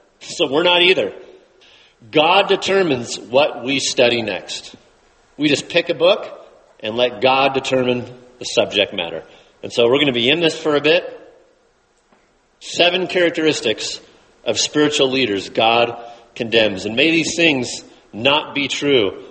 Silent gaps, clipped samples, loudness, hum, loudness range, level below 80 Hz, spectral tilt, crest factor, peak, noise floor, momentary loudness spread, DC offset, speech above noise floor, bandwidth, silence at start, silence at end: none; under 0.1%; -17 LUFS; none; 3 LU; -58 dBFS; -3 dB/octave; 18 dB; 0 dBFS; -59 dBFS; 14 LU; under 0.1%; 42 dB; 8.8 kHz; 0.2 s; 0 s